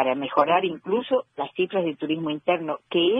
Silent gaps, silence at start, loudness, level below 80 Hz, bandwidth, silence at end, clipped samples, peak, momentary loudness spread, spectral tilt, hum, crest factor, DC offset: none; 0 s; -25 LUFS; -70 dBFS; 5.4 kHz; 0 s; under 0.1%; -6 dBFS; 6 LU; -8 dB/octave; none; 18 dB; under 0.1%